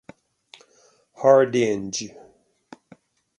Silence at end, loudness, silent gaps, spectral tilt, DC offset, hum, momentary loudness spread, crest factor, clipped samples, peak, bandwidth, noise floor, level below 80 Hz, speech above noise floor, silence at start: 1.3 s; -20 LUFS; none; -4.5 dB/octave; under 0.1%; none; 14 LU; 22 dB; under 0.1%; -2 dBFS; 10.5 kHz; -59 dBFS; -66 dBFS; 40 dB; 1.2 s